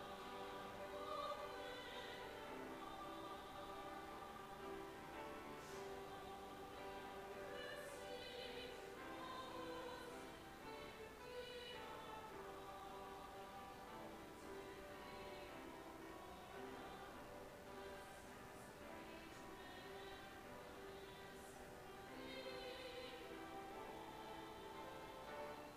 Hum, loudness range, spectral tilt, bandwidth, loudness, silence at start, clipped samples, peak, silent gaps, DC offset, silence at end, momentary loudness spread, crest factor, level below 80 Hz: none; 4 LU; -4 dB/octave; 15.5 kHz; -54 LUFS; 0 s; under 0.1%; -36 dBFS; none; under 0.1%; 0 s; 5 LU; 18 dB; -72 dBFS